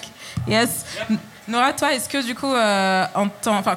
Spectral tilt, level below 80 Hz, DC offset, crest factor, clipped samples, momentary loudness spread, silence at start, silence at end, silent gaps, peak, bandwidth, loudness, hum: -3.5 dB/octave; -54 dBFS; under 0.1%; 16 dB; under 0.1%; 8 LU; 0 s; 0 s; none; -6 dBFS; 17 kHz; -21 LUFS; none